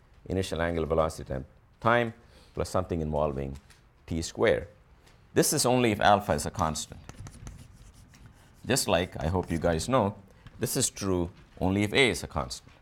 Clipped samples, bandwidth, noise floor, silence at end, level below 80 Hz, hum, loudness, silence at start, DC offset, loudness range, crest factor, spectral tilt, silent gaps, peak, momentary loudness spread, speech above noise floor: under 0.1%; 18 kHz; -57 dBFS; 0.2 s; -46 dBFS; none; -28 LUFS; 0.3 s; under 0.1%; 5 LU; 22 dB; -4.5 dB/octave; none; -8 dBFS; 17 LU; 30 dB